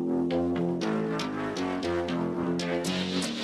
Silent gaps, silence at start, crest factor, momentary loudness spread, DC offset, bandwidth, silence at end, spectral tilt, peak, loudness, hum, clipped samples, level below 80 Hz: none; 0 s; 12 dB; 3 LU; under 0.1%; 14 kHz; 0 s; -5.5 dB/octave; -16 dBFS; -29 LUFS; none; under 0.1%; -62 dBFS